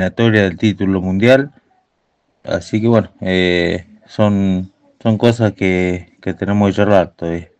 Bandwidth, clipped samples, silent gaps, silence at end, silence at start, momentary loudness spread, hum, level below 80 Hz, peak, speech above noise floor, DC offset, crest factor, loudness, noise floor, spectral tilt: 8.8 kHz; 0.2%; none; 0.15 s; 0 s; 11 LU; none; -52 dBFS; 0 dBFS; 50 dB; under 0.1%; 16 dB; -15 LUFS; -65 dBFS; -7 dB/octave